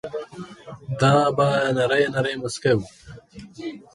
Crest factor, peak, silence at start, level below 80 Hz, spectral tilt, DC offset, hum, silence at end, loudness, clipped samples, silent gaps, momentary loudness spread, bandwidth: 18 dB; -4 dBFS; 0.05 s; -54 dBFS; -5.5 dB/octave; under 0.1%; none; 0.15 s; -21 LUFS; under 0.1%; none; 21 LU; 11.5 kHz